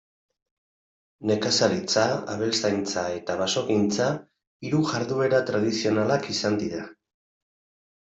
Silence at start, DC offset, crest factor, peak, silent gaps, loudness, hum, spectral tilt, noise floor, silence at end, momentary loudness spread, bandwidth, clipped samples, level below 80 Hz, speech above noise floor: 1.2 s; under 0.1%; 20 dB; -6 dBFS; 4.47-4.60 s; -25 LUFS; none; -4.5 dB/octave; under -90 dBFS; 1.1 s; 7 LU; 8.2 kHz; under 0.1%; -66 dBFS; over 66 dB